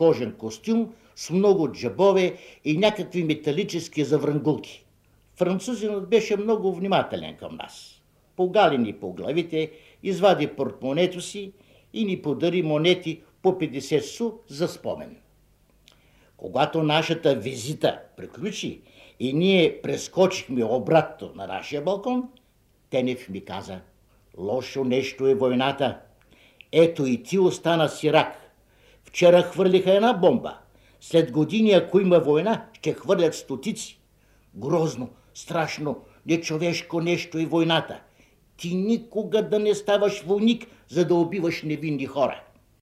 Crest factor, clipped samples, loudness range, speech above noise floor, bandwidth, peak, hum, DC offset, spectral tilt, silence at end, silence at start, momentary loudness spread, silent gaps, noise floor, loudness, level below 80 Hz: 20 dB; under 0.1%; 6 LU; 39 dB; 14.5 kHz; -4 dBFS; none; under 0.1%; -5.5 dB/octave; 0.4 s; 0 s; 15 LU; none; -62 dBFS; -24 LUFS; -62 dBFS